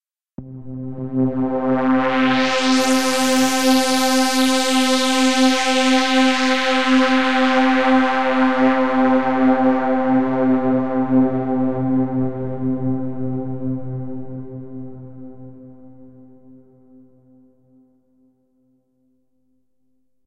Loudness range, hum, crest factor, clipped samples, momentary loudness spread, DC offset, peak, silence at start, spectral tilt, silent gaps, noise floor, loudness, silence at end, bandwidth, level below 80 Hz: 13 LU; none; 16 dB; under 0.1%; 16 LU; 3%; -2 dBFS; 0 s; -4 dB/octave; none; -71 dBFS; -17 LUFS; 0 s; 15 kHz; -54 dBFS